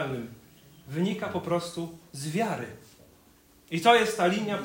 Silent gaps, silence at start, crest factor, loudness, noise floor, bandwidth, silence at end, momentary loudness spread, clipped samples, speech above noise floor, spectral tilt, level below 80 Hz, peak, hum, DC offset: none; 0 s; 22 dB; -28 LUFS; -59 dBFS; 16.5 kHz; 0 s; 16 LU; under 0.1%; 32 dB; -5 dB/octave; -64 dBFS; -8 dBFS; none; under 0.1%